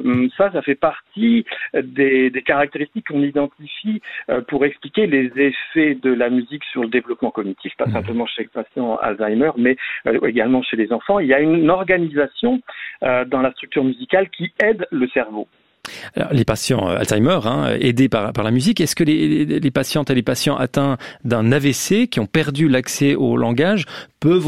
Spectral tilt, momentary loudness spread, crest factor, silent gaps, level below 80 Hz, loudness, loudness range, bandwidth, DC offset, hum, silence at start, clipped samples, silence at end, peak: -5.5 dB/octave; 8 LU; 16 dB; none; -52 dBFS; -18 LUFS; 3 LU; 15 kHz; under 0.1%; none; 0 s; under 0.1%; 0 s; -2 dBFS